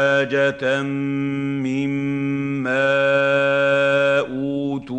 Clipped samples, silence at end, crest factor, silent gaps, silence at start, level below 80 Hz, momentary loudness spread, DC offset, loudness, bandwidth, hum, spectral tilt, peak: under 0.1%; 0 s; 14 dB; none; 0 s; -58 dBFS; 7 LU; under 0.1%; -20 LUFS; 8.8 kHz; none; -6.5 dB/octave; -6 dBFS